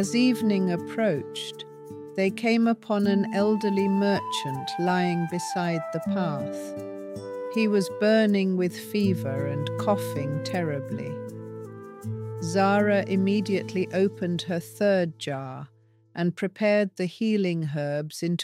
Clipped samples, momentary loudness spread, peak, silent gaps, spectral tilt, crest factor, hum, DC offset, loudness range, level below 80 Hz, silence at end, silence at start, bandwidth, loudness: under 0.1%; 14 LU; -10 dBFS; none; -6 dB/octave; 16 dB; none; under 0.1%; 3 LU; -72 dBFS; 0 s; 0 s; 15.5 kHz; -26 LUFS